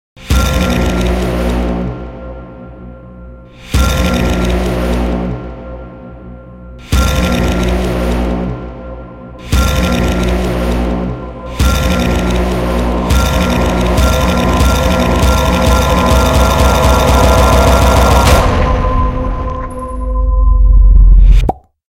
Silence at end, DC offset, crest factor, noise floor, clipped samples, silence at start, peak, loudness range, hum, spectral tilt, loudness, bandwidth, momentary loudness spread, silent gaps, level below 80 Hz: 0.4 s; under 0.1%; 12 dB; -32 dBFS; 0.3%; 0.2 s; 0 dBFS; 8 LU; none; -5.5 dB/octave; -12 LUFS; 16.5 kHz; 20 LU; none; -14 dBFS